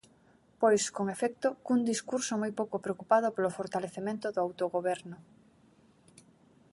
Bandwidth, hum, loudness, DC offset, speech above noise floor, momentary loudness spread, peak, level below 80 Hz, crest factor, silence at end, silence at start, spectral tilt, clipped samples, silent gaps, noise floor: 11.5 kHz; none; -31 LUFS; under 0.1%; 33 dB; 9 LU; -12 dBFS; -76 dBFS; 20 dB; 1.5 s; 0.6 s; -4.5 dB/octave; under 0.1%; none; -64 dBFS